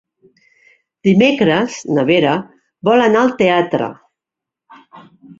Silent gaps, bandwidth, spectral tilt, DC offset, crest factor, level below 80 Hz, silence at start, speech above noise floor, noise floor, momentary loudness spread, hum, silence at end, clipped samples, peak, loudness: none; 7.8 kHz; -6 dB/octave; under 0.1%; 14 dB; -58 dBFS; 1.05 s; 71 dB; -84 dBFS; 9 LU; none; 0.05 s; under 0.1%; -2 dBFS; -14 LUFS